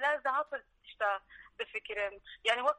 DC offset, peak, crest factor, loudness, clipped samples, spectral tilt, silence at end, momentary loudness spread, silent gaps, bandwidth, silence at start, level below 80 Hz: under 0.1%; -14 dBFS; 22 dB; -35 LUFS; under 0.1%; -0.5 dB/octave; 0.05 s; 12 LU; none; 10.5 kHz; 0 s; -70 dBFS